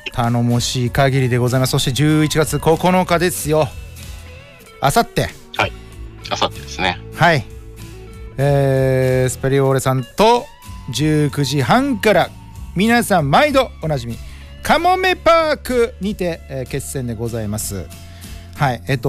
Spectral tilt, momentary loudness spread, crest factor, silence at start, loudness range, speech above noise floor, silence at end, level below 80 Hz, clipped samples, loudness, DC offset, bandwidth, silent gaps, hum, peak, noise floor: -5 dB/octave; 20 LU; 14 dB; 0.05 s; 5 LU; 23 dB; 0 s; -36 dBFS; under 0.1%; -17 LUFS; under 0.1%; 16 kHz; none; none; -4 dBFS; -39 dBFS